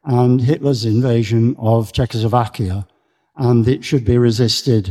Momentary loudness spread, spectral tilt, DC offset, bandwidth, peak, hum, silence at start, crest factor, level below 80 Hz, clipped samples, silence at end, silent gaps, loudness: 7 LU; -7 dB/octave; under 0.1%; 13 kHz; 0 dBFS; none; 0.05 s; 16 dB; -40 dBFS; under 0.1%; 0 s; none; -16 LUFS